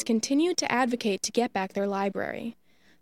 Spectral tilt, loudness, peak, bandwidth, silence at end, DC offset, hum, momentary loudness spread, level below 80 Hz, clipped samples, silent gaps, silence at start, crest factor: -3.5 dB/octave; -27 LUFS; -8 dBFS; 15.5 kHz; 0.5 s; under 0.1%; none; 9 LU; -70 dBFS; under 0.1%; none; 0 s; 20 dB